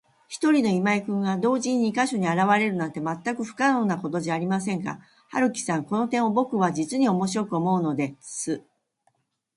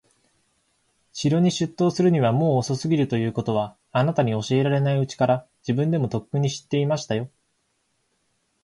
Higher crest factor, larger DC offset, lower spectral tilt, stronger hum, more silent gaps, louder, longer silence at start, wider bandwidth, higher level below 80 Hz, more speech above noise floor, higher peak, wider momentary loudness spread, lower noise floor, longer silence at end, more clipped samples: about the same, 18 dB vs 14 dB; neither; about the same, -5.5 dB/octave vs -6.5 dB/octave; neither; neither; about the same, -25 LUFS vs -23 LUFS; second, 0.3 s vs 1.15 s; about the same, 11.5 kHz vs 11.5 kHz; second, -70 dBFS vs -60 dBFS; about the same, 46 dB vs 49 dB; about the same, -6 dBFS vs -8 dBFS; about the same, 9 LU vs 7 LU; about the same, -70 dBFS vs -71 dBFS; second, 0.95 s vs 1.35 s; neither